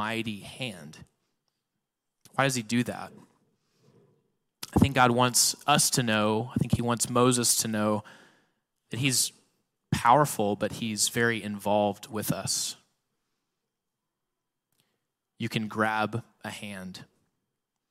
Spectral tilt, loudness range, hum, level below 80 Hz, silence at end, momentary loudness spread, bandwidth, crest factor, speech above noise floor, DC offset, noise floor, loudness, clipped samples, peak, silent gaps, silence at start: -3.5 dB/octave; 10 LU; none; -56 dBFS; 0.85 s; 17 LU; 16 kHz; 22 dB; 58 dB; under 0.1%; -85 dBFS; -26 LUFS; under 0.1%; -8 dBFS; none; 0 s